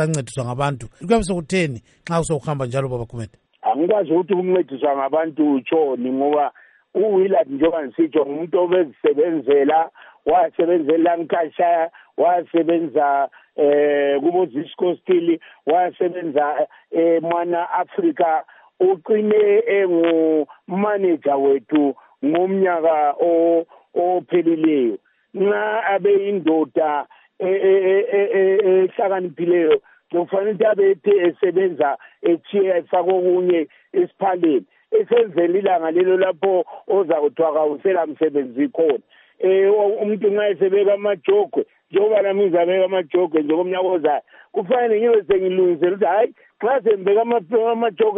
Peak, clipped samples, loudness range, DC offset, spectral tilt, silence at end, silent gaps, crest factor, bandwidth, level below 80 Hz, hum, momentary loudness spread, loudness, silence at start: -4 dBFS; under 0.1%; 2 LU; under 0.1%; -6.5 dB/octave; 0 s; none; 14 dB; 10 kHz; -54 dBFS; none; 7 LU; -19 LUFS; 0 s